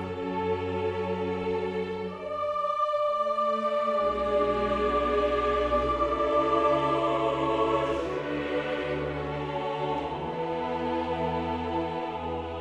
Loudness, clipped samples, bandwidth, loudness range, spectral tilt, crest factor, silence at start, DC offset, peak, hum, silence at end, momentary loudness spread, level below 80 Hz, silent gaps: -28 LUFS; under 0.1%; 9.8 kHz; 5 LU; -7 dB/octave; 16 dB; 0 s; under 0.1%; -12 dBFS; none; 0 s; 7 LU; -46 dBFS; none